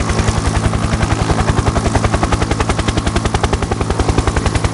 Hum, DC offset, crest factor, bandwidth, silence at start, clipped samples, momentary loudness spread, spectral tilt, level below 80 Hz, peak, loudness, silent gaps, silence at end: none; under 0.1%; 14 dB; 11.5 kHz; 0 s; under 0.1%; 2 LU; -5.5 dB/octave; -20 dBFS; 0 dBFS; -16 LUFS; none; 0 s